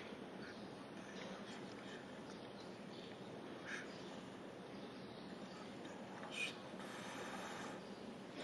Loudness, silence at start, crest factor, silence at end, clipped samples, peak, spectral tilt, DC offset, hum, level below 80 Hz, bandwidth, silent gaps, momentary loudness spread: -51 LUFS; 0 s; 20 dB; 0 s; under 0.1%; -32 dBFS; -4 dB/octave; under 0.1%; none; -82 dBFS; 15 kHz; none; 5 LU